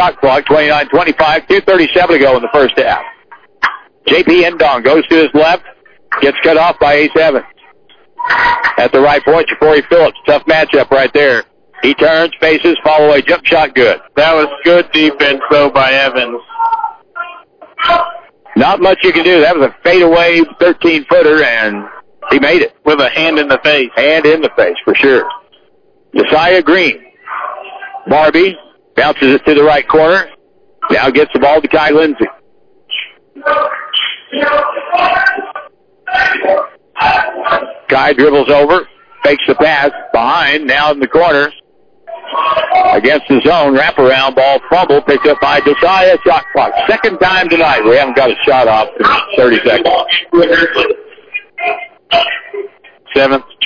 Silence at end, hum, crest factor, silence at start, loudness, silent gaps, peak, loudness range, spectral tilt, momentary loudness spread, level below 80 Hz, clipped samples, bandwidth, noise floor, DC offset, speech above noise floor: 0 s; none; 10 dB; 0 s; -9 LUFS; none; 0 dBFS; 4 LU; -5.5 dB/octave; 11 LU; -42 dBFS; under 0.1%; 5.4 kHz; -51 dBFS; under 0.1%; 42 dB